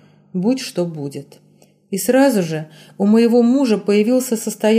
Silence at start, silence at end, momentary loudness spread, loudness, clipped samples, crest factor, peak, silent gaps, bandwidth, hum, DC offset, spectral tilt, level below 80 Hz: 0.35 s; 0 s; 15 LU; -17 LUFS; under 0.1%; 14 dB; -4 dBFS; none; 15.5 kHz; none; under 0.1%; -5.5 dB/octave; -68 dBFS